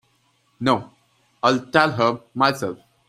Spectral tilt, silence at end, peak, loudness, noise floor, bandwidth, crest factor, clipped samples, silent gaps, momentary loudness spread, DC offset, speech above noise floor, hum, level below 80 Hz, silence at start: -5 dB/octave; 0.35 s; -2 dBFS; -21 LUFS; -64 dBFS; 15 kHz; 20 dB; under 0.1%; none; 7 LU; under 0.1%; 44 dB; none; -62 dBFS; 0.6 s